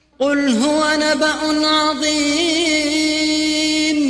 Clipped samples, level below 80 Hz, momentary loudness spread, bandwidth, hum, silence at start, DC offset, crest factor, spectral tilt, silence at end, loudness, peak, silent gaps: under 0.1%; -50 dBFS; 2 LU; 11 kHz; none; 0.2 s; under 0.1%; 12 dB; -2 dB/octave; 0 s; -16 LUFS; -6 dBFS; none